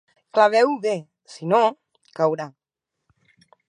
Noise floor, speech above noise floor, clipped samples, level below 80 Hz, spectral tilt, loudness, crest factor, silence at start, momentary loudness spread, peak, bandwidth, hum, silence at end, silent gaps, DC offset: -75 dBFS; 55 dB; under 0.1%; -78 dBFS; -5.5 dB/octave; -21 LUFS; 20 dB; 0.35 s; 16 LU; -4 dBFS; 10.5 kHz; none; 1.2 s; none; under 0.1%